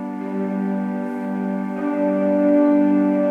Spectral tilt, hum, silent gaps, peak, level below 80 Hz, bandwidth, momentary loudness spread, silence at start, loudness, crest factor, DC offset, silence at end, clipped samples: -10 dB/octave; none; none; -6 dBFS; -76 dBFS; 3.5 kHz; 10 LU; 0 s; -20 LUFS; 12 dB; under 0.1%; 0 s; under 0.1%